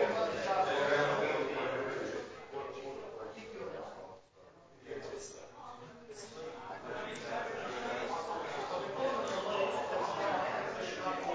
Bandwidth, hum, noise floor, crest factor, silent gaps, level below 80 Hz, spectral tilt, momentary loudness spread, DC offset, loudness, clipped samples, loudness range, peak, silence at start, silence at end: 8 kHz; none; -60 dBFS; 20 dB; none; -70 dBFS; -4 dB/octave; 17 LU; under 0.1%; -37 LUFS; under 0.1%; 12 LU; -18 dBFS; 0 s; 0 s